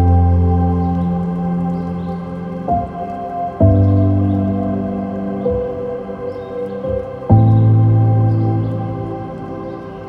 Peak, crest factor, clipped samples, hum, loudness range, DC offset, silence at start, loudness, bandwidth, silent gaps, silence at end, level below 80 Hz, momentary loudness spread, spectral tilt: 0 dBFS; 16 dB; under 0.1%; none; 4 LU; under 0.1%; 0 s; -17 LUFS; 3.5 kHz; none; 0 s; -30 dBFS; 13 LU; -11.5 dB/octave